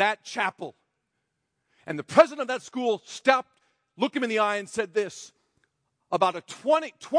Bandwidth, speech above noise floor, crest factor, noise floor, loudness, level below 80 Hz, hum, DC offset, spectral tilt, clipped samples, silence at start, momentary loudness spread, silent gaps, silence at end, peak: 10.5 kHz; 54 dB; 24 dB; -79 dBFS; -26 LUFS; -76 dBFS; none; under 0.1%; -3.5 dB/octave; under 0.1%; 0 s; 14 LU; none; 0 s; -2 dBFS